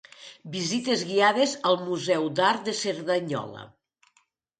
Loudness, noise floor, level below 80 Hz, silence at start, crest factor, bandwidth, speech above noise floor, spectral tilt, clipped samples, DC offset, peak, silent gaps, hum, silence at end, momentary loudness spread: -25 LUFS; -69 dBFS; -74 dBFS; 0.2 s; 20 dB; 9.4 kHz; 43 dB; -3.5 dB/octave; under 0.1%; under 0.1%; -8 dBFS; none; none; 0.9 s; 17 LU